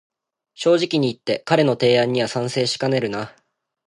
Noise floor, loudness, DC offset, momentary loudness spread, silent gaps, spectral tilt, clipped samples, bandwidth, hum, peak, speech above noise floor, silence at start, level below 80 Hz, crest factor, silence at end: -52 dBFS; -20 LUFS; under 0.1%; 9 LU; none; -5 dB/octave; under 0.1%; 11.5 kHz; none; -4 dBFS; 33 dB; 0.6 s; -64 dBFS; 18 dB; 0.55 s